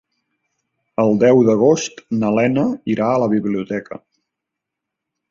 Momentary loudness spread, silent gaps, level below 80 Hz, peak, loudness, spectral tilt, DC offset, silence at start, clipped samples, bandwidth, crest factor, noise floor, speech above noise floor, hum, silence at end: 14 LU; none; -58 dBFS; -2 dBFS; -17 LUFS; -6.5 dB/octave; under 0.1%; 1 s; under 0.1%; 7.6 kHz; 16 dB; -82 dBFS; 66 dB; none; 1.35 s